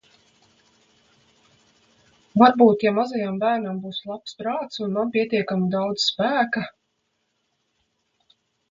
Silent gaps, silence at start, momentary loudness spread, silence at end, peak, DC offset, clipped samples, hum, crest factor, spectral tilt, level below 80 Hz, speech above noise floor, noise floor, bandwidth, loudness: none; 2.35 s; 14 LU; 2 s; 0 dBFS; under 0.1%; under 0.1%; none; 24 dB; -5.5 dB/octave; -68 dBFS; 52 dB; -73 dBFS; 7.6 kHz; -22 LUFS